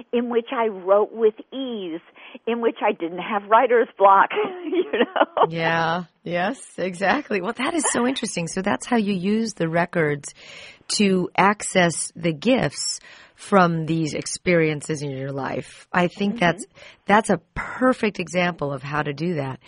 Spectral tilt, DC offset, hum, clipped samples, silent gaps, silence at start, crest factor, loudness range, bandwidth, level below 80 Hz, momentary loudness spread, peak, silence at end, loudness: -4.5 dB/octave; under 0.1%; none; under 0.1%; none; 0.15 s; 20 dB; 4 LU; 11 kHz; -56 dBFS; 11 LU; -2 dBFS; 0.1 s; -22 LUFS